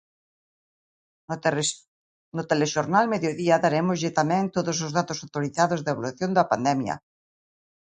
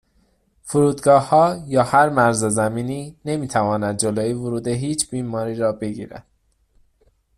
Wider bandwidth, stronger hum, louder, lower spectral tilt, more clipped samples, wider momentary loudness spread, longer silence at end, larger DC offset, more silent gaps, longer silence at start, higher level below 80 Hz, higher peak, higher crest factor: second, 9.6 kHz vs 14.5 kHz; neither; second, -24 LUFS vs -19 LUFS; about the same, -5 dB/octave vs -5 dB/octave; neither; second, 9 LU vs 12 LU; second, 0.85 s vs 1.2 s; neither; first, 1.88-2.32 s vs none; first, 1.3 s vs 0.65 s; second, -66 dBFS vs -54 dBFS; second, -6 dBFS vs -2 dBFS; about the same, 20 dB vs 18 dB